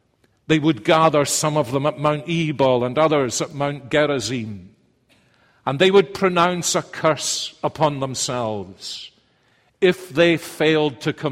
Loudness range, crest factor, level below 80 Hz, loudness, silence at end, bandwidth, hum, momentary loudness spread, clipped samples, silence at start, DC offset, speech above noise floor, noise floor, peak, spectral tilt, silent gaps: 4 LU; 18 dB; -56 dBFS; -20 LUFS; 0 s; 16 kHz; none; 11 LU; under 0.1%; 0.5 s; under 0.1%; 41 dB; -61 dBFS; -2 dBFS; -4.5 dB/octave; none